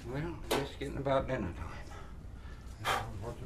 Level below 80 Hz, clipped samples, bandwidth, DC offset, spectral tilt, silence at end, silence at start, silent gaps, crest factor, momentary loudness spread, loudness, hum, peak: -48 dBFS; under 0.1%; 15.5 kHz; under 0.1%; -5 dB/octave; 0 s; 0 s; none; 20 dB; 16 LU; -36 LUFS; none; -18 dBFS